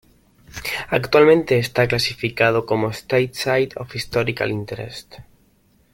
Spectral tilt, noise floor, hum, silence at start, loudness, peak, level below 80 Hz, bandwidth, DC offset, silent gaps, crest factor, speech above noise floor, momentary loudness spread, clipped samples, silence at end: -5.5 dB/octave; -58 dBFS; none; 0.55 s; -19 LUFS; -2 dBFS; -50 dBFS; 17 kHz; under 0.1%; none; 18 dB; 39 dB; 16 LU; under 0.1%; 0.7 s